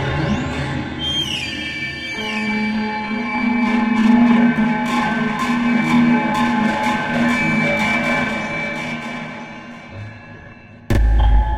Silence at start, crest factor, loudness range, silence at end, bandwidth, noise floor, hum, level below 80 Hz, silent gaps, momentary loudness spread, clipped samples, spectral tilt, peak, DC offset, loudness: 0 s; 16 dB; 6 LU; 0 s; 13 kHz; -40 dBFS; none; -26 dBFS; none; 16 LU; under 0.1%; -5.5 dB/octave; -2 dBFS; under 0.1%; -18 LUFS